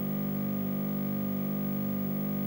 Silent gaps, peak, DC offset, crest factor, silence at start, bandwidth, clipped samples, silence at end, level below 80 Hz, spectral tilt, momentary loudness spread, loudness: none; -22 dBFS; under 0.1%; 8 dB; 0 s; 16 kHz; under 0.1%; 0 s; -64 dBFS; -9 dB/octave; 0 LU; -32 LUFS